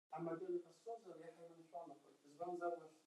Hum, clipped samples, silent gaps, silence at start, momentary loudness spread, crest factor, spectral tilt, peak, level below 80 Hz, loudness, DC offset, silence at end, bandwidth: none; under 0.1%; none; 0.1 s; 15 LU; 18 dB; -7.5 dB/octave; -32 dBFS; under -90 dBFS; -50 LUFS; under 0.1%; 0.05 s; 12 kHz